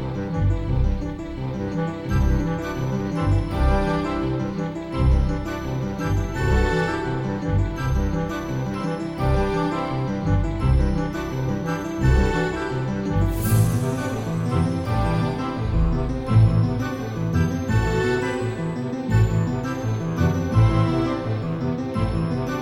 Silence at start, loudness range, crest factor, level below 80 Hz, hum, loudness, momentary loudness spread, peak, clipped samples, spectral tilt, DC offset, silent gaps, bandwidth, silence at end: 0 s; 2 LU; 16 dB; -28 dBFS; none; -23 LUFS; 7 LU; -6 dBFS; under 0.1%; -7.5 dB/octave; under 0.1%; none; 16 kHz; 0 s